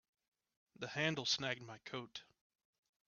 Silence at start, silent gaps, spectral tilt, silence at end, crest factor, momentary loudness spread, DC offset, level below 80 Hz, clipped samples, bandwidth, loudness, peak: 0.8 s; none; -2 dB/octave; 0.85 s; 24 dB; 15 LU; under 0.1%; -82 dBFS; under 0.1%; 7 kHz; -40 LUFS; -22 dBFS